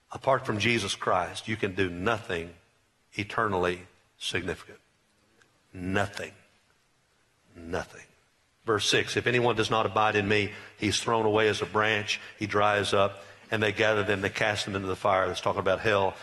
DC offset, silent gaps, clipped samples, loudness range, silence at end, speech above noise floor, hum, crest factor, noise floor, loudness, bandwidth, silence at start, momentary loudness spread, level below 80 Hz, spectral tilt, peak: under 0.1%; none; under 0.1%; 11 LU; 0 s; 41 dB; none; 20 dB; -68 dBFS; -27 LUFS; 12 kHz; 0.1 s; 12 LU; -60 dBFS; -4 dB/octave; -10 dBFS